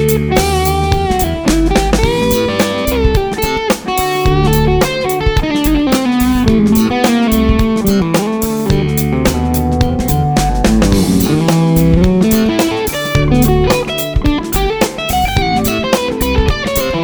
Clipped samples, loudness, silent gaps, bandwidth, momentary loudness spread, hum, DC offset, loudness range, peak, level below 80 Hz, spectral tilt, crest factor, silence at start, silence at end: under 0.1%; -13 LUFS; none; over 20 kHz; 4 LU; none; under 0.1%; 2 LU; 0 dBFS; -20 dBFS; -5.5 dB/octave; 12 dB; 0 s; 0 s